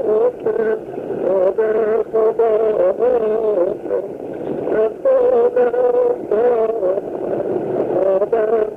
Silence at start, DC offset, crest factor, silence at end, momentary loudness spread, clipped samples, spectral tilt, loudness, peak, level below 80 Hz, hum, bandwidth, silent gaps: 0 s; under 0.1%; 10 dB; 0 s; 8 LU; under 0.1%; -8.5 dB/octave; -17 LUFS; -6 dBFS; -54 dBFS; none; 3.8 kHz; none